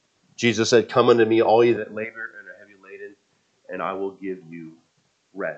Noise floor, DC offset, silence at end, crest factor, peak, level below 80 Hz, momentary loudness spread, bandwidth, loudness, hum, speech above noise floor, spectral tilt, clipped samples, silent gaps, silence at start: -67 dBFS; under 0.1%; 0 s; 20 dB; -2 dBFS; -76 dBFS; 24 LU; 8.4 kHz; -20 LUFS; none; 47 dB; -5 dB/octave; under 0.1%; none; 0.4 s